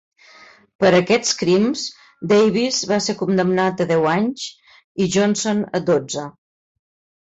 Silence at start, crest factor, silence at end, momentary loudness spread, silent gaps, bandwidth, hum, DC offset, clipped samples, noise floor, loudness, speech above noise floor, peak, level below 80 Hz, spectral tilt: 0.8 s; 16 dB; 0.9 s; 13 LU; 4.84-4.95 s; 8 kHz; none; under 0.1%; under 0.1%; -47 dBFS; -18 LUFS; 30 dB; -4 dBFS; -58 dBFS; -4.5 dB/octave